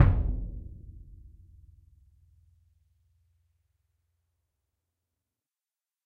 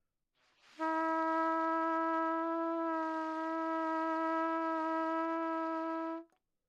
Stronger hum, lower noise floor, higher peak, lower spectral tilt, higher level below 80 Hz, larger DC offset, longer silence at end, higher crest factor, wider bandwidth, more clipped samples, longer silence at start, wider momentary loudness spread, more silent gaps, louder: neither; first, under -90 dBFS vs -78 dBFS; first, -6 dBFS vs -22 dBFS; first, -10.5 dB/octave vs -4 dB/octave; first, -38 dBFS vs under -90 dBFS; neither; first, 5.05 s vs 0.45 s; first, 28 dB vs 14 dB; second, 4.1 kHz vs 7.4 kHz; neither; second, 0 s vs 0.8 s; first, 27 LU vs 5 LU; neither; first, -31 LUFS vs -35 LUFS